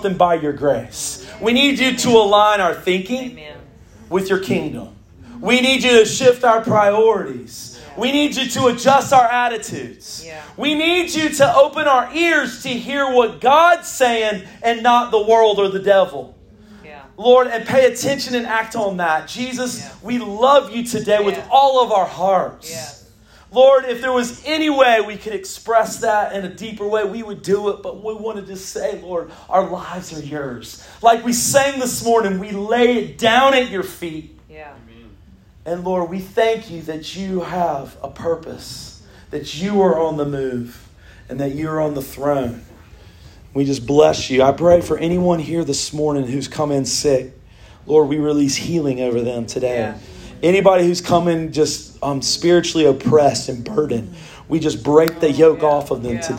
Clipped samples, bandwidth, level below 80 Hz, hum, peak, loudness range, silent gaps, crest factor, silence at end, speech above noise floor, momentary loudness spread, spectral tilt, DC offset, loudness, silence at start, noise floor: under 0.1%; 16.5 kHz; -48 dBFS; none; 0 dBFS; 7 LU; none; 16 dB; 0 s; 30 dB; 16 LU; -4 dB/octave; under 0.1%; -17 LUFS; 0 s; -47 dBFS